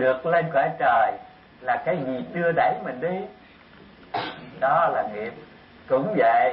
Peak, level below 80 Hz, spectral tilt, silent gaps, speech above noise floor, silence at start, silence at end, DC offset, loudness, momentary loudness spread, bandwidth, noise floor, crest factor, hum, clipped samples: -10 dBFS; -62 dBFS; -10 dB/octave; none; 26 dB; 0 s; 0 s; under 0.1%; -24 LUFS; 13 LU; 5.6 kHz; -49 dBFS; 14 dB; none; under 0.1%